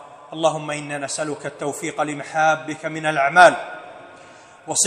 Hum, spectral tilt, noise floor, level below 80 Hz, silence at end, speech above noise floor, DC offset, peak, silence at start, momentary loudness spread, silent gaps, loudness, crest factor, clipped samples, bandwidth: none; -2.5 dB/octave; -45 dBFS; -68 dBFS; 0 s; 25 dB; under 0.1%; 0 dBFS; 0 s; 17 LU; none; -20 LUFS; 22 dB; under 0.1%; 14 kHz